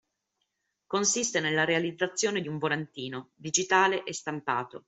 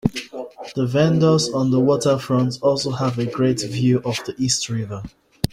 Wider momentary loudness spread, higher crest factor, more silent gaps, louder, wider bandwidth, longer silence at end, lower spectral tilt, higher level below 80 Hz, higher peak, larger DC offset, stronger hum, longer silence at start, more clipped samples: second, 11 LU vs 14 LU; about the same, 22 dB vs 18 dB; neither; second, -28 LUFS vs -20 LUFS; second, 8.4 kHz vs 16 kHz; about the same, 0.1 s vs 0.05 s; second, -2.5 dB/octave vs -5.5 dB/octave; second, -72 dBFS vs -48 dBFS; second, -8 dBFS vs -2 dBFS; neither; neither; first, 0.9 s vs 0.05 s; neither